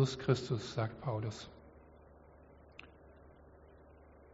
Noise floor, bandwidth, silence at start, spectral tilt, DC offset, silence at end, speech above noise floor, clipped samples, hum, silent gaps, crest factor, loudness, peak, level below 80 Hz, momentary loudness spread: -59 dBFS; 8 kHz; 0 s; -6 dB/octave; under 0.1%; 0 s; 23 dB; under 0.1%; none; none; 24 dB; -37 LUFS; -16 dBFS; -62 dBFS; 26 LU